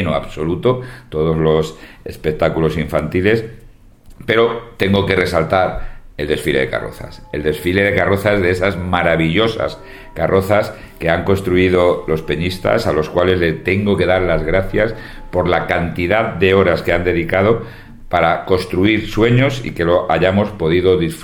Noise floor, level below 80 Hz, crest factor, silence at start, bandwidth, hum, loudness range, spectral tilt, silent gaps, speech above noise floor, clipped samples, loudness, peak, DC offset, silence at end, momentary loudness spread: -41 dBFS; -34 dBFS; 16 dB; 0 s; 18 kHz; none; 2 LU; -6.5 dB/octave; none; 25 dB; under 0.1%; -16 LUFS; 0 dBFS; under 0.1%; 0 s; 9 LU